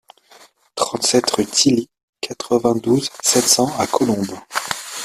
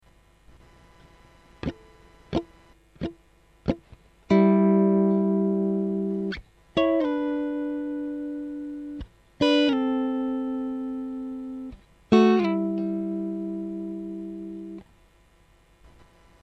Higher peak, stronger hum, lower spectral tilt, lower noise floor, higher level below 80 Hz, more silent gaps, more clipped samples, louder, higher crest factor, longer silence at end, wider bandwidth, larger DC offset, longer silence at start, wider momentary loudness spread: first, 0 dBFS vs -4 dBFS; second, none vs 50 Hz at -60 dBFS; second, -3 dB/octave vs -8 dB/octave; second, -49 dBFS vs -58 dBFS; about the same, -56 dBFS vs -52 dBFS; first, 2.03-2.13 s vs none; neither; first, -17 LUFS vs -26 LUFS; about the same, 20 dB vs 22 dB; second, 0 s vs 1.6 s; first, 15.5 kHz vs 7.8 kHz; neither; second, 0.75 s vs 1.65 s; second, 13 LU vs 17 LU